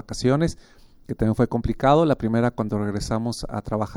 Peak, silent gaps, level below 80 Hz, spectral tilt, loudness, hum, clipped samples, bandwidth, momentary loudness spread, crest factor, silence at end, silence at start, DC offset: -4 dBFS; none; -40 dBFS; -7 dB/octave; -23 LUFS; none; under 0.1%; 15.5 kHz; 9 LU; 18 dB; 0 s; 0.1 s; under 0.1%